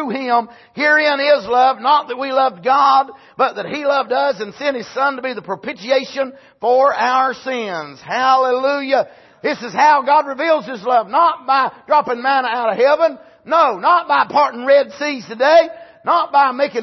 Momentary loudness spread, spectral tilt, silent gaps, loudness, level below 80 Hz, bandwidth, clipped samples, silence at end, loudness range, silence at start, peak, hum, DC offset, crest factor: 10 LU; -4 dB/octave; none; -16 LUFS; -66 dBFS; 6.2 kHz; under 0.1%; 0 s; 4 LU; 0 s; -2 dBFS; none; under 0.1%; 14 dB